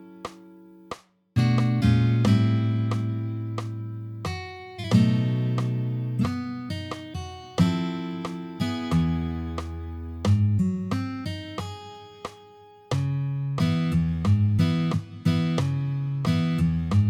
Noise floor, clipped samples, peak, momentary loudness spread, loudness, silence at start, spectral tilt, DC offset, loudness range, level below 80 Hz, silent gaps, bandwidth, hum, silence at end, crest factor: -50 dBFS; under 0.1%; -6 dBFS; 15 LU; -26 LUFS; 0 s; -7.5 dB/octave; under 0.1%; 5 LU; -44 dBFS; none; 11.5 kHz; none; 0 s; 18 dB